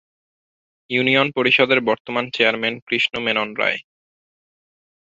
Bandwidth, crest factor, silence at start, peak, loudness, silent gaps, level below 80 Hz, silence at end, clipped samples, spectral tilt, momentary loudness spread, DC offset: 7.8 kHz; 20 dB; 0.9 s; -2 dBFS; -18 LUFS; 2.00-2.05 s, 2.82-2.87 s; -64 dBFS; 1.25 s; under 0.1%; -5 dB/octave; 8 LU; under 0.1%